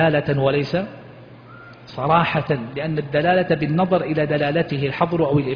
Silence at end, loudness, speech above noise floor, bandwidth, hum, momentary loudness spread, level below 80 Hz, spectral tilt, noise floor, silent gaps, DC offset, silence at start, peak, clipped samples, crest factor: 0 s; -20 LUFS; 22 dB; 5.2 kHz; none; 8 LU; -50 dBFS; -9 dB/octave; -42 dBFS; none; under 0.1%; 0 s; -4 dBFS; under 0.1%; 16 dB